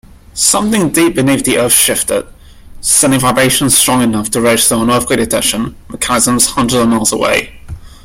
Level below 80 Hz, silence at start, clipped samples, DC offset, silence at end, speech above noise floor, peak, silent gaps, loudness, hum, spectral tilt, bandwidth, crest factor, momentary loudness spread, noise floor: -36 dBFS; 0.35 s; under 0.1%; under 0.1%; 0.1 s; 21 dB; 0 dBFS; none; -10 LUFS; none; -3 dB/octave; over 20 kHz; 12 dB; 8 LU; -32 dBFS